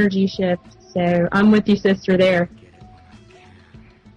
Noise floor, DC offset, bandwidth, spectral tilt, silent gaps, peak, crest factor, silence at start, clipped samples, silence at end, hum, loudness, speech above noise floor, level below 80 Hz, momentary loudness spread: -47 dBFS; under 0.1%; 7.4 kHz; -7.5 dB/octave; none; -6 dBFS; 14 dB; 0 s; under 0.1%; 1.35 s; none; -18 LUFS; 29 dB; -50 dBFS; 10 LU